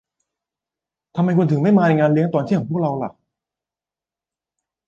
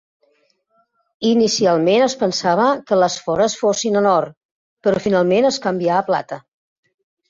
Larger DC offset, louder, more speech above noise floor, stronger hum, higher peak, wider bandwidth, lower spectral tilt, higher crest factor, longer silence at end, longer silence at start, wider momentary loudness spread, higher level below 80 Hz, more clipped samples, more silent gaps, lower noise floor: neither; about the same, -18 LUFS vs -17 LUFS; first, 73 dB vs 47 dB; neither; about the same, -4 dBFS vs -2 dBFS; about the same, 7.2 kHz vs 7.8 kHz; first, -9.5 dB/octave vs -4.5 dB/octave; about the same, 16 dB vs 16 dB; first, 1.75 s vs 0.9 s; about the same, 1.15 s vs 1.2 s; first, 12 LU vs 7 LU; about the same, -62 dBFS vs -58 dBFS; neither; second, none vs 4.37-4.77 s; first, -90 dBFS vs -63 dBFS